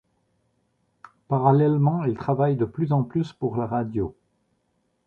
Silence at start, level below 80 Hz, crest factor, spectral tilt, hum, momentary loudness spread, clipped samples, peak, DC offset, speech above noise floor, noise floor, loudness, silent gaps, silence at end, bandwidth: 1.3 s; -54 dBFS; 20 dB; -10.5 dB/octave; none; 9 LU; under 0.1%; -4 dBFS; under 0.1%; 49 dB; -71 dBFS; -23 LUFS; none; 0.95 s; 4.6 kHz